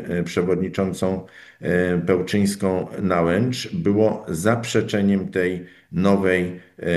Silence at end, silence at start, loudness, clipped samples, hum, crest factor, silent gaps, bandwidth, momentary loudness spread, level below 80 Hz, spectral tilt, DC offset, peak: 0 s; 0 s; -22 LUFS; under 0.1%; none; 18 dB; none; 12.5 kHz; 6 LU; -52 dBFS; -6.5 dB/octave; under 0.1%; -4 dBFS